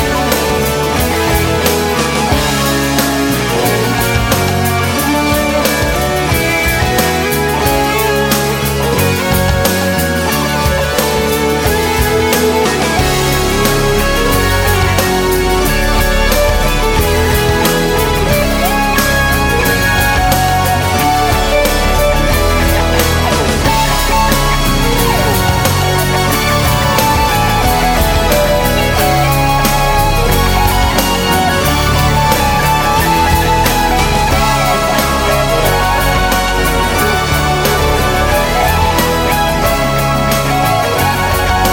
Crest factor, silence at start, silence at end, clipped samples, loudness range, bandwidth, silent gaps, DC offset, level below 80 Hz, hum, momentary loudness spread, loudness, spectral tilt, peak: 12 dB; 0 s; 0 s; under 0.1%; 1 LU; 17 kHz; none; under 0.1%; -20 dBFS; none; 2 LU; -12 LUFS; -4 dB/octave; 0 dBFS